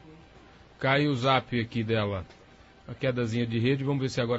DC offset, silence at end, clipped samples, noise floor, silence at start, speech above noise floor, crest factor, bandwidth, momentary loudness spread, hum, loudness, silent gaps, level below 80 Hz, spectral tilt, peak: under 0.1%; 0 s; under 0.1%; -54 dBFS; 0.05 s; 27 dB; 18 dB; 8 kHz; 8 LU; none; -28 LUFS; none; -56 dBFS; -6.5 dB/octave; -10 dBFS